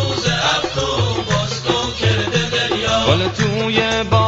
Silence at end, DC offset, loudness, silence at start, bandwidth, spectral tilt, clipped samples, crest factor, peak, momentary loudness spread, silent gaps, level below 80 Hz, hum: 0 s; under 0.1%; -17 LUFS; 0 s; 8 kHz; -4.5 dB/octave; under 0.1%; 16 dB; -2 dBFS; 3 LU; none; -36 dBFS; none